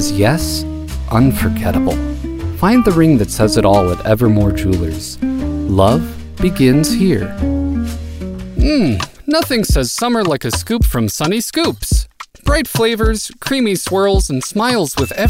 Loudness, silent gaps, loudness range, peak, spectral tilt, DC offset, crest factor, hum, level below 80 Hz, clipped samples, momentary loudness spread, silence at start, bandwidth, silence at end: -15 LUFS; none; 3 LU; 0 dBFS; -5.5 dB/octave; 0.2%; 14 dB; none; -24 dBFS; under 0.1%; 9 LU; 0 s; 16.5 kHz; 0 s